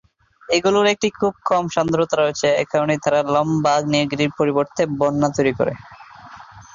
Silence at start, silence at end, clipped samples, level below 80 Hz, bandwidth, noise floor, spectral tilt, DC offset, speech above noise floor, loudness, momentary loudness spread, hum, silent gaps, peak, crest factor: 0.5 s; 0.15 s; under 0.1%; -54 dBFS; 7.6 kHz; -41 dBFS; -5 dB/octave; under 0.1%; 22 dB; -19 LUFS; 4 LU; none; none; -4 dBFS; 16 dB